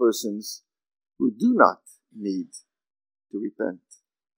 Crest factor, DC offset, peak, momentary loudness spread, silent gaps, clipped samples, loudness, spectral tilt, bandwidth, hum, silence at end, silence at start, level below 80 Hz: 26 dB; under 0.1%; 0 dBFS; 22 LU; none; under 0.1%; -25 LUFS; -4.5 dB/octave; 16 kHz; none; 0.6 s; 0 s; -80 dBFS